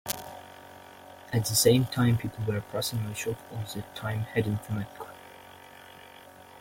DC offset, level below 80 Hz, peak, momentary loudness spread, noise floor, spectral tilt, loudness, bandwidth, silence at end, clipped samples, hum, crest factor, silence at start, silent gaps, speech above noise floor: under 0.1%; -58 dBFS; -4 dBFS; 26 LU; -50 dBFS; -4.5 dB/octave; -29 LUFS; 16.5 kHz; 0 s; under 0.1%; none; 26 dB; 0.05 s; none; 22 dB